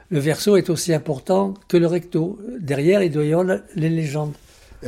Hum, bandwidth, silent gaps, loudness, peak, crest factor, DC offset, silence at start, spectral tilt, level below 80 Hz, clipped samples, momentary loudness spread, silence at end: none; 16 kHz; none; -20 LUFS; -4 dBFS; 16 dB; under 0.1%; 0.1 s; -6 dB/octave; -54 dBFS; under 0.1%; 8 LU; 0 s